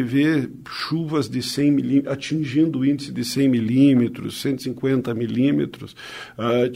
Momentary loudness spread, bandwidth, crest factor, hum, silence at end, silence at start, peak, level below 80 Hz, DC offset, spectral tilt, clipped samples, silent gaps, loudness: 12 LU; 16 kHz; 16 dB; none; 0 s; 0 s; -4 dBFS; -58 dBFS; under 0.1%; -6.5 dB/octave; under 0.1%; none; -21 LUFS